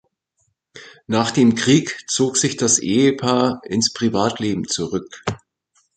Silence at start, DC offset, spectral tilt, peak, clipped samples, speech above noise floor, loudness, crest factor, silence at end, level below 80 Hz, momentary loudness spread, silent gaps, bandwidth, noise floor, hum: 0.75 s; under 0.1%; -4 dB/octave; -2 dBFS; under 0.1%; 50 dB; -18 LUFS; 18 dB; 0.6 s; -54 dBFS; 10 LU; none; 9.4 kHz; -69 dBFS; none